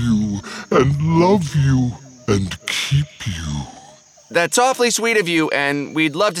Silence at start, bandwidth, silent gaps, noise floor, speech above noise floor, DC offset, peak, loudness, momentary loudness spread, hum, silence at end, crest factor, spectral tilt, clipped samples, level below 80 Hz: 0 s; 15.5 kHz; none; -46 dBFS; 28 dB; under 0.1%; -2 dBFS; -18 LUFS; 11 LU; none; 0 s; 16 dB; -5 dB/octave; under 0.1%; -40 dBFS